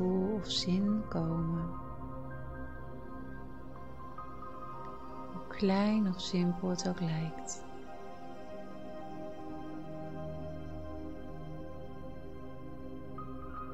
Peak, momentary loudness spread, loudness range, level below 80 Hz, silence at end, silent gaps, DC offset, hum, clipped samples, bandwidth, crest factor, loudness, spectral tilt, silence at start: -20 dBFS; 16 LU; 11 LU; -54 dBFS; 0 s; none; 0.6%; none; under 0.1%; 8.6 kHz; 18 dB; -38 LUFS; -6 dB/octave; 0 s